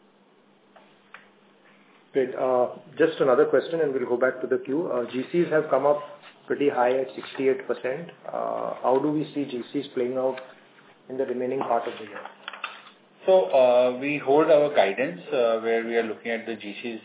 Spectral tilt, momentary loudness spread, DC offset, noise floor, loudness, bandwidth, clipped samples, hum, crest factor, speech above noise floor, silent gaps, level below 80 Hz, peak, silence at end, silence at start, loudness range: -9.5 dB/octave; 15 LU; under 0.1%; -59 dBFS; -25 LUFS; 4 kHz; under 0.1%; none; 18 dB; 35 dB; none; -84 dBFS; -6 dBFS; 0.05 s; 1.15 s; 7 LU